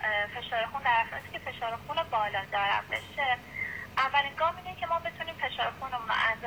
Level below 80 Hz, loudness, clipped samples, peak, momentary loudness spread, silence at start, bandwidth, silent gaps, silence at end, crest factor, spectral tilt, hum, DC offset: -58 dBFS; -30 LUFS; under 0.1%; -14 dBFS; 9 LU; 0 s; over 20 kHz; none; 0 s; 18 dB; -3.5 dB/octave; none; under 0.1%